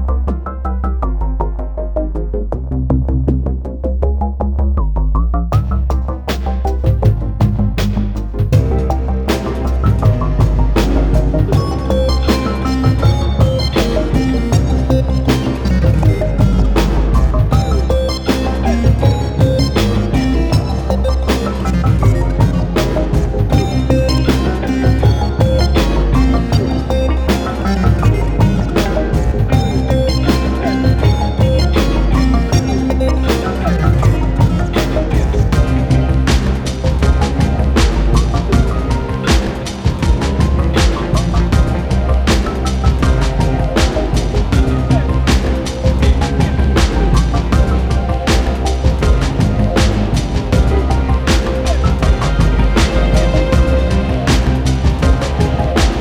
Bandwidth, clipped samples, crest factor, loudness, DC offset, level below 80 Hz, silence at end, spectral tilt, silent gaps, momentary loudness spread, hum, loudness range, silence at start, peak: 19 kHz; under 0.1%; 12 dB; -15 LUFS; under 0.1%; -16 dBFS; 0 s; -6.5 dB/octave; none; 4 LU; none; 2 LU; 0 s; 0 dBFS